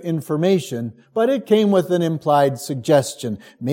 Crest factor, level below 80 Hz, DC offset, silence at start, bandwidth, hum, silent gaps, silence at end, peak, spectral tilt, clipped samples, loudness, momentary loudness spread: 16 dB; -68 dBFS; under 0.1%; 0 s; 17 kHz; none; none; 0 s; -4 dBFS; -6 dB/octave; under 0.1%; -19 LUFS; 12 LU